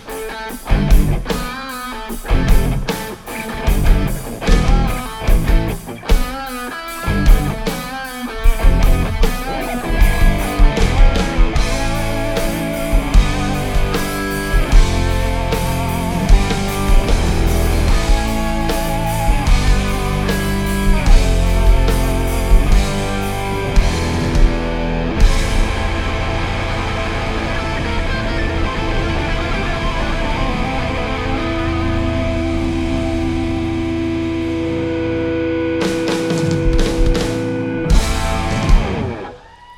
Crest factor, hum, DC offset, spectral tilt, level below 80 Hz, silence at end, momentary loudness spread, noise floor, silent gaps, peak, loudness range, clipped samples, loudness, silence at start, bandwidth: 14 dB; none; under 0.1%; -5.5 dB/octave; -16 dBFS; 0.05 s; 6 LU; -37 dBFS; none; 0 dBFS; 3 LU; under 0.1%; -18 LUFS; 0 s; 16.5 kHz